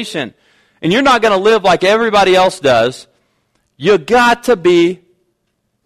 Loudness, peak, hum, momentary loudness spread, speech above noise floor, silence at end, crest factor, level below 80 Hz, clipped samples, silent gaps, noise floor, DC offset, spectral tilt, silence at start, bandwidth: -11 LUFS; -2 dBFS; none; 11 LU; 56 dB; 0.9 s; 12 dB; -46 dBFS; under 0.1%; none; -67 dBFS; under 0.1%; -4.5 dB/octave; 0 s; 15 kHz